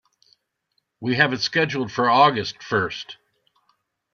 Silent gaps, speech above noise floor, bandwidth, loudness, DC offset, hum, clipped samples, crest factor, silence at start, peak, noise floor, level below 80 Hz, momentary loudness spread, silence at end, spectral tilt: none; 52 dB; 7.2 kHz; -21 LUFS; under 0.1%; none; under 0.1%; 20 dB; 1 s; -2 dBFS; -73 dBFS; -64 dBFS; 14 LU; 1 s; -5 dB/octave